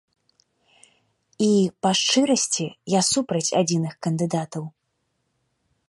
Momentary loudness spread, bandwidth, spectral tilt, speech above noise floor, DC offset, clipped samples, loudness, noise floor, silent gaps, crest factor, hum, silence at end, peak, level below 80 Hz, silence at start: 8 LU; 11.5 kHz; -4 dB/octave; 52 dB; under 0.1%; under 0.1%; -22 LUFS; -74 dBFS; none; 18 dB; none; 1.2 s; -6 dBFS; -68 dBFS; 1.4 s